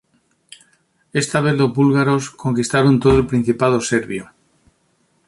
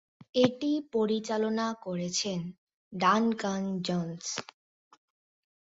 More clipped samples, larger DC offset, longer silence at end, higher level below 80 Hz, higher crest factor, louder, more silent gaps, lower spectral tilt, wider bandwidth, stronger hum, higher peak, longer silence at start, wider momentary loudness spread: neither; neither; second, 1.05 s vs 1.3 s; first, -40 dBFS vs -72 dBFS; second, 16 dB vs 22 dB; first, -17 LUFS vs -30 LUFS; second, none vs 2.58-2.67 s, 2.76-2.91 s; first, -6 dB/octave vs -4.5 dB/octave; first, 11.5 kHz vs 8 kHz; neither; first, -2 dBFS vs -10 dBFS; first, 1.15 s vs 0.35 s; about the same, 8 LU vs 10 LU